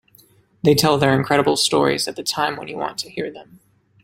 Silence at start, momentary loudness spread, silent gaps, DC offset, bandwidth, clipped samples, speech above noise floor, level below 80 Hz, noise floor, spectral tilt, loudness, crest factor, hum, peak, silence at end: 0.65 s; 12 LU; none; under 0.1%; 16.5 kHz; under 0.1%; 35 dB; -54 dBFS; -54 dBFS; -4 dB/octave; -19 LUFS; 20 dB; none; 0 dBFS; 0.6 s